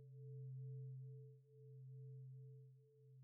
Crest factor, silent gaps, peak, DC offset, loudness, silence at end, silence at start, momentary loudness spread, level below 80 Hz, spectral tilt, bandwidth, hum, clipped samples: 10 dB; none; -48 dBFS; under 0.1%; -57 LUFS; 0 s; 0 s; 13 LU; under -90 dBFS; -10.5 dB/octave; 0.6 kHz; none; under 0.1%